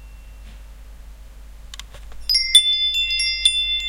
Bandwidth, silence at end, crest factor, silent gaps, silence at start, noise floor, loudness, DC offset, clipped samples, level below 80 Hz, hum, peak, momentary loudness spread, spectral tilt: 17 kHz; 0 s; 22 dB; none; 0 s; -39 dBFS; -15 LUFS; under 0.1%; under 0.1%; -40 dBFS; none; 0 dBFS; 25 LU; 2 dB/octave